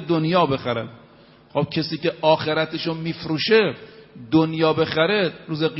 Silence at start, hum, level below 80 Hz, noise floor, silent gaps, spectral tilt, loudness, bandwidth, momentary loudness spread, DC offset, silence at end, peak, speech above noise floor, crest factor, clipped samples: 0 s; none; -58 dBFS; -50 dBFS; none; -9 dB/octave; -21 LUFS; 6 kHz; 9 LU; under 0.1%; 0 s; -4 dBFS; 29 dB; 18 dB; under 0.1%